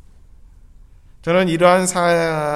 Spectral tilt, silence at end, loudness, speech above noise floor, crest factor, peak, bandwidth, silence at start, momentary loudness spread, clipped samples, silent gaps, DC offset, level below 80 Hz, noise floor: -4.5 dB/octave; 0 s; -16 LUFS; 29 dB; 18 dB; 0 dBFS; 14 kHz; 1.25 s; 5 LU; under 0.1%; none; under 0.1%; -46 dBFS; -44 dBFS